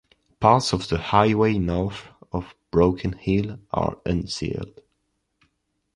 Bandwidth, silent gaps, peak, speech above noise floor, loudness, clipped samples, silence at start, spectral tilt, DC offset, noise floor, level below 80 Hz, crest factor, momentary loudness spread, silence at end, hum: 11.5 kHz; none; -2 dBFS; 51 dB; -23 LUFS; under 0.1%; 0.4 s; -6.5 dB/octave; under 0.1%; -74 dBFS; -42 dBFS; 22 dB; 14 LU; 1.25 s; none